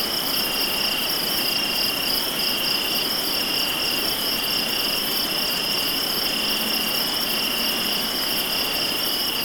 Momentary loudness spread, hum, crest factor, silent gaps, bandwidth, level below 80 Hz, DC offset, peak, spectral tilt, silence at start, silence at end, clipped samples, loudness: 1 LU; none; 14 dB; none; 19.5 kHz; -50 dBFS; under 0.1%; -8 dBFS; -1 dB/octave; 0 s; 0 s; under 0.1%; -20 LUFS